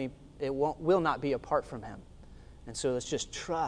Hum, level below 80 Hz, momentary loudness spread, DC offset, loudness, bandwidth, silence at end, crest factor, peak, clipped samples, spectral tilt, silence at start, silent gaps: none; -54 dBFS; 16 LU; under 0.1%; -32 LUFS; 10.5 kHz; 0 s; 18 dB; -14 dBFS; under 0.1%; -5 dB/octave; 0 s; none